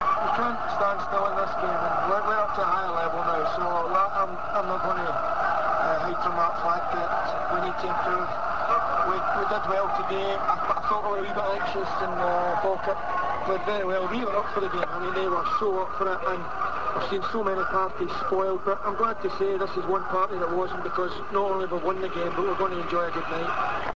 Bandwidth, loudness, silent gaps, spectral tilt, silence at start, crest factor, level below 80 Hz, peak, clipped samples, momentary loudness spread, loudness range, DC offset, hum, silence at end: 8 kHz; -26 LUFS; none; -6 dB/octave; 0 s; 16 dB; -52 dBFS; -10 dBFS; under 0.1%; 4 LU; 2 LU; 2%; none; 0.05 s